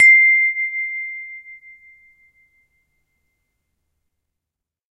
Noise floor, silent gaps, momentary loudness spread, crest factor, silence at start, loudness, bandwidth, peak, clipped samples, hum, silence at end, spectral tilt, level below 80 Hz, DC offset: -85 dBFS; none; 24 LU; 18 dB; 0 s; -14 LUFS; 10.5 kHz; -4 dBFS; under 0.1%; none; 3.45 s; 3.5 dB/octave; -74 dBFS; under 0.1%